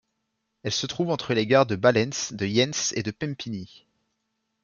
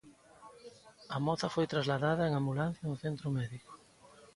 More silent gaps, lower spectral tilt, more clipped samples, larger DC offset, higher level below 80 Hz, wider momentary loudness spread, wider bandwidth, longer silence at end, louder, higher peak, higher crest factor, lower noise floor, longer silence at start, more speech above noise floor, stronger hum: neither; second, -4 dB/octave vs -6.5 dB/octave; neither; neither; about the same, -64 dBFS vs -66 dBFS; second, 13 LU vs 22 LU; second, 7.4 kHz vs 11.5 kHz; first, 1 s vs 0.1 s; first, -24 LUFS vs -34 LUFS; first, -6 dBFS vs -16 dBFS; about the same, 20 dB vs 18 dB; first, -78 dBFS vs -60 dBFS; first, 0.65 s vs 0.05 s; first, 53 dB vs 26 dB; neither